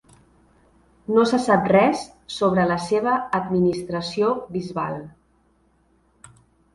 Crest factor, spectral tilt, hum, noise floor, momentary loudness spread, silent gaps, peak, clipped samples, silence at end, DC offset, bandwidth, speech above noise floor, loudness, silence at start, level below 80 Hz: 20 dB; -6 dB/octave; none; -62 dBFS; 12 LU; none; -4 dBFS; under 0.1%; 1.65 s; under 0.1%; 11.5 kHz; 41 dB; -21 LUFS; 1.1 s; -56 dBFS